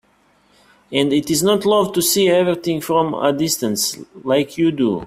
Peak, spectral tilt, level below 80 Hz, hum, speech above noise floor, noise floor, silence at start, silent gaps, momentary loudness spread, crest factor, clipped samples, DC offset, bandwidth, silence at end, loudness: 0 dBFS; -4 dB/octave; -56 dBFS; none; 40 dB; -57 dBFS; 0.9 s; none; 5 LU; 18 dB; under 0.1%; under 0.1%; 16 kHz; 0 s; -17 LUFS